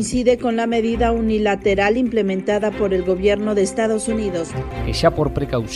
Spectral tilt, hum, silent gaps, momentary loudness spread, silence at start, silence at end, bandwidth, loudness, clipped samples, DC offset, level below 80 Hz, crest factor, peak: -5.5 dB/octave; none; none; 5 LU; 0 s; 0 s; 12 kHz; -19 LUFS; under 0.1%; under 0.1%; -34 dBFS; 18 dB; -2 dBFS